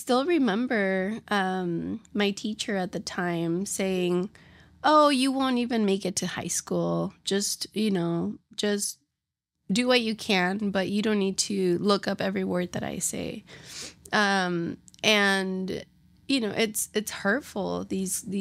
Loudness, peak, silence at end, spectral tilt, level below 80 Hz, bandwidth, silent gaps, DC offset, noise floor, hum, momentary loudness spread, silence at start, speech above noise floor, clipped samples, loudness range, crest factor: -26 LUFS; -6 dBFS; 0 s; -4 dB/octave; -64 dBFS; 16 kHz; none; under 0.1%; -85 dBFS; none; 9 LU; 0 s; 59 dB; under 0.1%; 3 LU; 20 dB